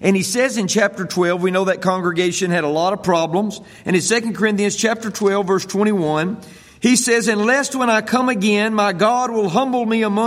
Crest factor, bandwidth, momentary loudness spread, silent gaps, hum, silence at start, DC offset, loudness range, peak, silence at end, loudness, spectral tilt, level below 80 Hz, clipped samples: 16 dB; 16 kHz; 4 LU; none; none; 0 s; under 0.1%; 2 LU; -2 dBFS; 0 s; -17 LUFS; -4 dB/octave; -60 dBFS; under 0.1%